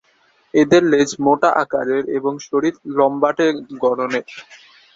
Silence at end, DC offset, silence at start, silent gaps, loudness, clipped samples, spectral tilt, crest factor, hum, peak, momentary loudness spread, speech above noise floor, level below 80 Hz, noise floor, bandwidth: 0.4 s; under 0.1%; 0.55 s; none; -17 LUFS; under 0.1%; -5 dB/octave; 18 dB; none; 0 dBFS; 9 LU; 41 dB; -60 dBFS; -58 dBFS; 7.8 kHz